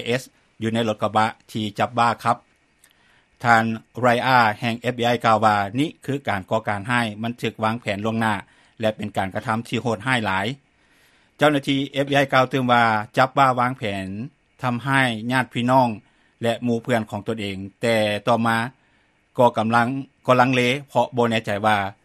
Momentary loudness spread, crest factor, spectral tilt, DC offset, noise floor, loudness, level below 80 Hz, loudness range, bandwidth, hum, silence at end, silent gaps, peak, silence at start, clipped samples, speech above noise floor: 10 LU; 22 dB; -5.5 dB/octave; under 0.1%; -62 dBFS; -21 LUFS; -60 dBFS; 5 LU; 14 kHz; none; 0.1 s; none; 0 dBFS; 0 s; under 0.1%; 41 dB